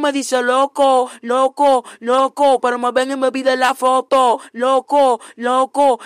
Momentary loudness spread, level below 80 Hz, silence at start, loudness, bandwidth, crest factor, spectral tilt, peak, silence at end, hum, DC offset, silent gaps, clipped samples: 4 LU; -66 dBFS; 0 s; -16 LUFS; 15 kHz; 12 dB; -2 dB/octave; -4 dBFS; 0 s; none; under 0.1%; none; under 0.1%